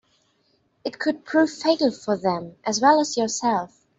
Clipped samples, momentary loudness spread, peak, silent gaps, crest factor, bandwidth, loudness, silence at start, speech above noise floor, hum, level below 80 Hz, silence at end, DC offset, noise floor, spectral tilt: under 0.1%; 9 LU; -4 dBFS; none; 18 dB; 8.2 kHz; -22 LUFS; 0.85 s; 44 dB; none; -68 dBFS; 0.3 s; under 0.1%; -66 dBFS; -3.5 dB/octave